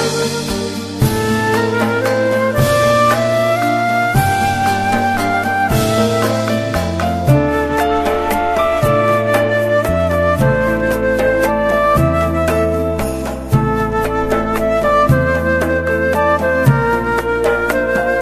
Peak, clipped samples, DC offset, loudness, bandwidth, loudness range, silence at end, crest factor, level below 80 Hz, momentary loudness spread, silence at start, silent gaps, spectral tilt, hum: 0 dBFS; under 0.1%; under 0.1%; -15 LUFS; 14 kHz; 1 LU; 0 s; 14 dB; -30 dBFS; 4 LU; 0 s; none; -6 dB/octave; none